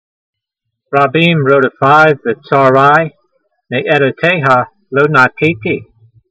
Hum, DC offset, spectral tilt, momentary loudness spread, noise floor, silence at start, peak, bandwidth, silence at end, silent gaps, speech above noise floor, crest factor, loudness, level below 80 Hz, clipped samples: none; under 0.1%; -7 dB/octave; 10 LU; -75 dBFS; 0.9 s; 0 dBFS; 8.6 kHz; 0.45 s; none; 65 dB; 12 dB; -11 LUFS; -56 dBFS; 0.2%